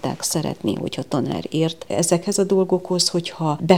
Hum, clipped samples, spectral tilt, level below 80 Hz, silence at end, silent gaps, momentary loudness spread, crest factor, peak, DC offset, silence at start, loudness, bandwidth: none; under 0.1%; -4.5 dB/octave; -58 dBFS; 0 s; none; 6 LU; 20 dB; 0 dBFS; 0.3%; 0.05 s; -21 LUFS; over 20 kHz